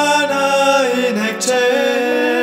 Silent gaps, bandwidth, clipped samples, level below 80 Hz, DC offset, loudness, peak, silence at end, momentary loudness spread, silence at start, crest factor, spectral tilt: none; 16 kHz; under 0.1%; -70 dBFS; under 0.1%; -15 LUFS; -2 dBFS; 0 s; 4 LU; 0 s; 12 dB; -2.5 dB/octave